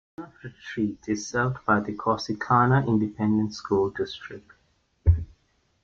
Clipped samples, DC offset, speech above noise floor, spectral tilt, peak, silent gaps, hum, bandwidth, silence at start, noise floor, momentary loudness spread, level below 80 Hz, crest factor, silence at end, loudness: under 0.1%; under 0.1%; 42 dB; -6.5 dB/octave; -8 dBFS; none; none; 7.6 kHz; 0.2 s; -67 dBFS; 20 LU; -40 dBFS; 18 dB; 0.6 s; -25 LUFS